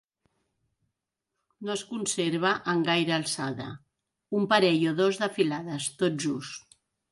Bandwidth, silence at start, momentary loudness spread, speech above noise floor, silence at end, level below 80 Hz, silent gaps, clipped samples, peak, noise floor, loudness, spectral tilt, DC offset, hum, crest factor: 11.5 kHz; 1.6 s; 15 LU; 58 dB; 0.5 s; -72 dBFS; none; under 0.1%; -8 dBFS; -85 dBFS; -27 LUFS; -4 dB/octave; under 0.1%; none; 22 dB